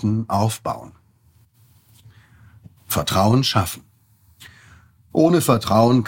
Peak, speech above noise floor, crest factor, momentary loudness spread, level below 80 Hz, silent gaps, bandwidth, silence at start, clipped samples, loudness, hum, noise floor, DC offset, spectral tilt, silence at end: -2 dBFS; 38 dB; 18 dB; 12 LU; -50 dBFS; none; 17 kHz; 0 s; under 0.1%; -19 LUFS; none; -56 dBFS; under 0.1%; -5.5 dB/octave; 0 s